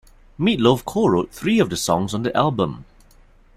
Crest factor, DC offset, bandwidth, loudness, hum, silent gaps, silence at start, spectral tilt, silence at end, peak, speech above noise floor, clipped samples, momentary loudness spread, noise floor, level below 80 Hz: 18 dB; under 0.1%; 16 kHz; -20 LUFS; none; none; 0.4 s; -5.5 dB/octave; 0.75 s; -2 dBFS; 31 dB; under 0.1%; 6 LU; -51 dBFS; -48 dBFS